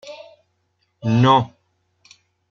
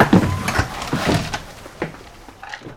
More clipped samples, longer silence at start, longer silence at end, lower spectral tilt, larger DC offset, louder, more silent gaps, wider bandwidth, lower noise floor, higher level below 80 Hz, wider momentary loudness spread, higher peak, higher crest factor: neither; about the same, 0.05 s vs 0 s; first, 1.05 s vs 0 s; first, -7 dB/octave vs -5.5 dB/octave; neither; first, -17 LUFS vs -21 LUFS; neither; second, 7 kHz vs 17 kHz; first, -69 dBFS vs -40 dBFS; second, -62 dBFS vs -36 dBFS; first, 24 LU vs 21 LU; second, -4 dBFS vs 0 dBFS; about the same, 20 dB vs 20 dB